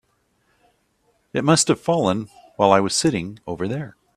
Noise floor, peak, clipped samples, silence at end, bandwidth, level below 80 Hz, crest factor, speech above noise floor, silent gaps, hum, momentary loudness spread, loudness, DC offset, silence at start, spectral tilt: -66 dBFS; 0 dBFS; under 0.1%; 0.25 s; 14.5 kHz; -56 dBFS; 22 dB; 46 dB; none; none; 12 LU; -20 LUFS; under 0.1%; 1.35 s; -4.5 dB/octave